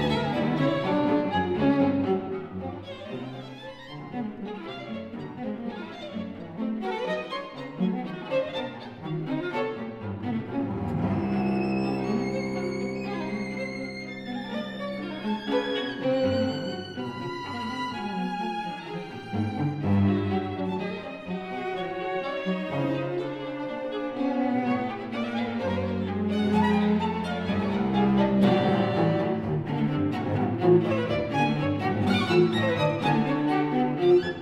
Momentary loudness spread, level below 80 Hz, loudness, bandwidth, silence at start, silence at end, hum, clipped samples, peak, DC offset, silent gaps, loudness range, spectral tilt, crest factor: 13 LU; -56 dBFS; -28 LUFS; 10 kHz; 0 s; 0 s; none; under 0.1%; -8 dBFS; under 0.1%; none; 8 LU; -7.5 dB/octave; 18 dB